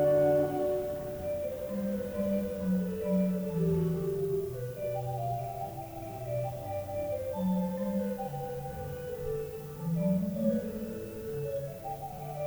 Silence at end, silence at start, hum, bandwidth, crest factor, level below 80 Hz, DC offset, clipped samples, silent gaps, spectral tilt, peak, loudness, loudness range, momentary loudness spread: 0 s; 0 s; none; over 20 kHz; 16 dB; -54 dBFS; under 0.1%; under 0.1%; none; -8.5 dB/octave; -16 dBFS; -33 LUFS; 3 LU; 10 LU